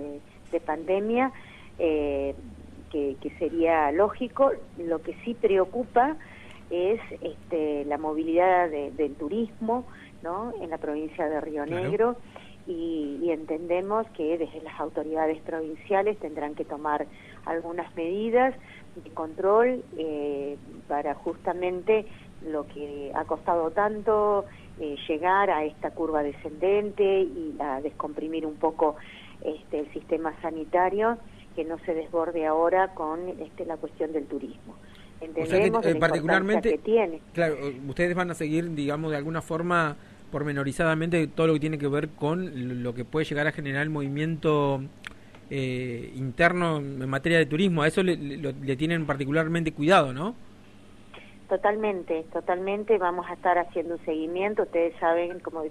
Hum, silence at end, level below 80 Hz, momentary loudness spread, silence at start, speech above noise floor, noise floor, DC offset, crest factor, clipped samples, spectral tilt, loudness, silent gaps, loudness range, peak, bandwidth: none; 0 s; -54 dBFS; 13 LU; 0 s; 24 dB; -51 dBFS; 0.2%; 20 dB; under 0.1%; -6.5 dB/octave; -27 LUFS; none; 4 LU; -8 dBFS; 12.5 kHz